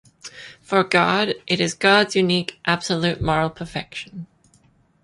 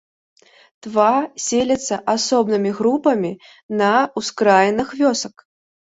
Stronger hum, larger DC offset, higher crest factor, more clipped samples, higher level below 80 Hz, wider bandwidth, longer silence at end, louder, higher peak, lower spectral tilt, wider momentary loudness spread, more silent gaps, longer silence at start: neither; neither; about the same, 20 dB vs 18 dB; neither; first, -48 dBFS vs -58 dBFS; first, 11.5 kHz vs 8 kHz; first, 0.8 s vs 0.55 s; about the same, -20 LUFS vs -18 LUFS; about the same, -2 dBFS vs -2 dBFS; about the same, -4.5 dB/octave vs -4 dB/octave; first, 21 LU vs 10 LU; second, none vs 3.63-3.69 s; second, 0.25 s vs 0.85 s